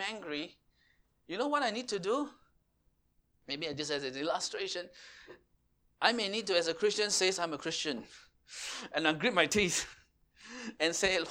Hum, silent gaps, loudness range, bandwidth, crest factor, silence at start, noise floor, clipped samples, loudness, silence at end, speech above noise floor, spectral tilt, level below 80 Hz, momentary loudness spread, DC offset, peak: none; none; 7 LU; 17.5 kHz; 26 dB; 0 s; -74 dBFS; under 0.1%; -33 LUFS; 0 s; 40 dB; -2 dB/octave; -66 dBFS; 15 LU; under 0.1%; -10 dBFS